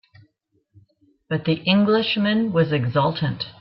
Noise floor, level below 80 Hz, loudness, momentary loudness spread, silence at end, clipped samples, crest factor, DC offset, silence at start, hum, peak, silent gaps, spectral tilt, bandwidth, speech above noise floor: -68 dBFS; -60 dBFS; -21 LUFS; 8 LU; 0.1 s; under 0.1%; 18 dB; under 0.1%; 1.3 s; none; -4 dBFS; none; -10 dB/octave; 5.8 kHz; 48 dB